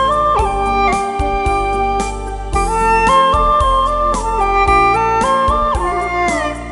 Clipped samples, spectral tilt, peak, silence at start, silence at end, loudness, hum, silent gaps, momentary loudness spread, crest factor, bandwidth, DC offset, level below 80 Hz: under 0.1%; -4.5 dB/octave; 0 dBFS; 0 s; 0 s; -14 LUFS; none; none; 7 LU; 14 dB; 11.5 kHz; under 0.1%; -24 dBFS